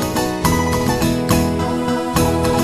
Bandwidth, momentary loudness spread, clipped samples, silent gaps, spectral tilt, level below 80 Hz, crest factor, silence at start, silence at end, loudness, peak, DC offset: 14 kHz; 3 LU; under 0.1%; none; -5 dB/octave; -32 dBFS; 16 dB; 0 s; 0 s; -17 LUFS; -2 dBFS; 0.4%